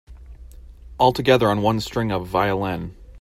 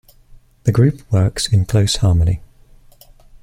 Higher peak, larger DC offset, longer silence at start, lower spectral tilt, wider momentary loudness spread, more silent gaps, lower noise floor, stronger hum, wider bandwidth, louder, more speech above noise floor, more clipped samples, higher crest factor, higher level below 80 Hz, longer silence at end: about the same, -2 dBFS vs -2 dBFS; neither; second, 0.1 s vs 0.65 s; about the same, -6 dB/octave vs -6 dB/octave; first, 10 LU vs 5 LU; neither; second, -41 dBFS vs -46 dBFS; neither; about the same, 16 kHz vs 15 kHz; second, -20 LUFS vs -17 LUFS; second, 22 dB vs 31 dB; neither; about the same, 20 dB vs 16 dB; second, -42 dBFS vs -34 dBFS; second, 0 s vs 1.05 s